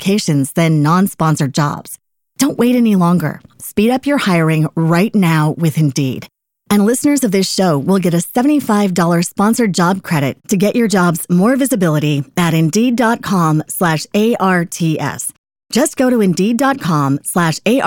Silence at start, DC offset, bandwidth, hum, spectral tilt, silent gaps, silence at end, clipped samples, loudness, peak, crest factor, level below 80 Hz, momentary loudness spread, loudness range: 0 s; under 0.1%; 17 kHz; none; -5.5 dB/octave; 15.38-15.44 s; 0 s; under 0.1%; -14 LUFS; -2 dBFS; 12 dB; -54 dBFS; 5 LU; 2 LU